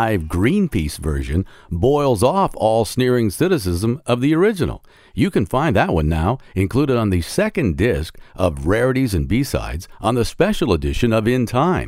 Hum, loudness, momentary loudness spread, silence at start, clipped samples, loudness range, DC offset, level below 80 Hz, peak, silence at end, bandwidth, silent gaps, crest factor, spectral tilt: none; -19 LUFS; 7 LU; 0 s; under 0.1%; 2 LU; under 0.1%; -32 dBFS; -2 dBFS; 0 s; 16 kHz; none; 16 dB; -6.5 dB/octave